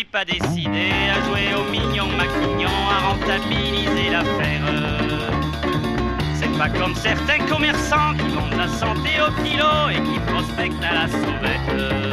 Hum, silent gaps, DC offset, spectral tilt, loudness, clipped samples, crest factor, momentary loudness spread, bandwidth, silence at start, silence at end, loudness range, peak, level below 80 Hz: none; none; under 0.1%; -5 dB/octave; -20 LUFS; under 0.1%; 14 dB; 4 LU; 14 kHz; 0 s; 0 s; 2 LU; -6 dBFS; -32 dBFS